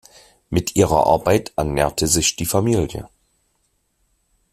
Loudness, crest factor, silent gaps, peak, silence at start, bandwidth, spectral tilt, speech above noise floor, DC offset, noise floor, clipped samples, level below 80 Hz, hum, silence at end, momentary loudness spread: -18 LUFS; 18 dB; none; -2 dBFS; 0.5 s; 16 kHz; -4.5 dB/octave; 49 dB; under 0.1%; -67 dBFS; under 0.1%; -40 dBFS; none; 1.45 s; 8 LU